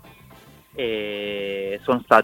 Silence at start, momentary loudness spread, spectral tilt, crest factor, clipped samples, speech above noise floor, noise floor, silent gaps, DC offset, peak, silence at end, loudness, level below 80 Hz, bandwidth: 0.05 s; 7 LU; -5 dB/octave; 24 dB; under 0.1%; 28 dB; -48 dBFS; none; under 0.1%; 0 dBFS; 0 s; -25 LUFS; -58 dBFS; 17 kHz